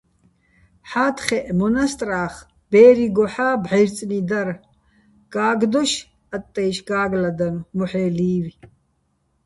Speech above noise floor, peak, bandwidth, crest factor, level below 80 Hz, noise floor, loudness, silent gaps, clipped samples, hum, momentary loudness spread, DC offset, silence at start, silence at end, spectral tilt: 48 dB; -2 dBFS; 11.5 kHz; 18 dB; -52 dBFS; -67 dBFS; -20 LUFS; none; under 0.1%; none; 12 LU; under 0.1%; 0.85 s; 0.8 s; -5.5 dB/octave